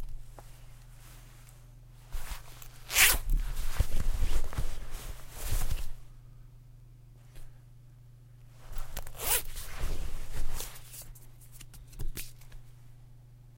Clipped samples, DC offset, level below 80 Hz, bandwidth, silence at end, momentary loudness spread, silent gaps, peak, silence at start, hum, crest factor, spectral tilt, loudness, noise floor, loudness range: under 0.1%; under 0.1%; -34 dBFS; 16.5 kHz; 0.2 s; 26 LU; none; -6 dBFS; 0 s; none; 24 dB; -1.5 dB/octave; -32 LUFS; -53 dBFS; 15 LU